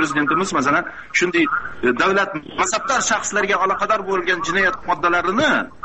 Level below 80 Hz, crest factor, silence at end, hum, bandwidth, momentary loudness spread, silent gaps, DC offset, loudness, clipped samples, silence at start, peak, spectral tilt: -50 dBFS; 16 dB; 0.15 s; none; 8.4 kHz; 4 LU; none; 0.7%; -18 LUFS; under 0.1%; 0 s; -4 dBFS; -3 dB/octave